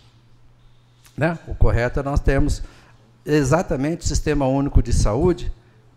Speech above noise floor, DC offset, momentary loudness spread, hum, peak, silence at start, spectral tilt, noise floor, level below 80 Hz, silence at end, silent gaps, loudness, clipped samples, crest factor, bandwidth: 32 dB; under 0.1%; 11 LU; none; -2 dBFS; 1.2 s; -6.5 dB/octave; -51 dBFS; -24 dBFS; 0.45 s; none; -21 LUFS; under 0.1%; 18 dB; 13 kHz